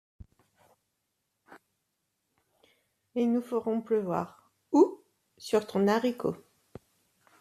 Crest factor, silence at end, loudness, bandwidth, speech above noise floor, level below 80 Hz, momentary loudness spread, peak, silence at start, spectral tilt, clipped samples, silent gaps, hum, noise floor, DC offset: 22 dB; 1.05 s; -29 LUFS; 14 kHz; 52 dB; -68 dBFS; 16 LU; -10 dBFS; 1.5 s; -6.5 dB/octave; under 0.1%; none; none; -81 dBFS; under 0.1%